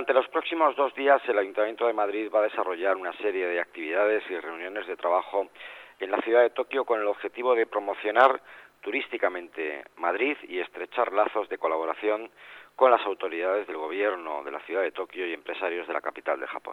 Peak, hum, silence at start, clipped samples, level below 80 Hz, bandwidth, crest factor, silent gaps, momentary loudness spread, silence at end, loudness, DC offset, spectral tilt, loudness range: -6 dBFS; none; 0 s; under 0.1%; -78 dBFS; 10.5 kHz; 22 dB; none; 12 LU; 0 s; -27 LUFS; under 0.1%; -4.5 dB/octave; 4 LU